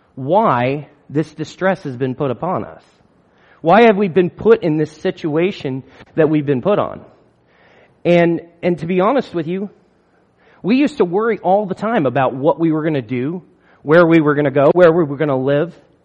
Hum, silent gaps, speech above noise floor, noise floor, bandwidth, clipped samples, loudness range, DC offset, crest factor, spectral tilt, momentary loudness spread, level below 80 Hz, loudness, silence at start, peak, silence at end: none; none; 41 dB; -56 dBFS; 8.6 kHz; under 0.1%; 5 LU; under 0.1%; 16 dB; -8 dB/octave; 14 LU; -56 dBFS; -16 LUFS; 0.15 s; 0 dBFS; 0.35 s